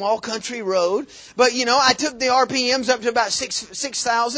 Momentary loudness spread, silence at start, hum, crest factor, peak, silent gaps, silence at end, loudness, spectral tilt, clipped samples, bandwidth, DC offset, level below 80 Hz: 9 LU; 0 s; none; 18 dB; -4 dBFS; none; 0 s; -19 LUFS; -1.5 dB/octave; under 0.1%; 8 kHz; under 0.1%; -58 dBFS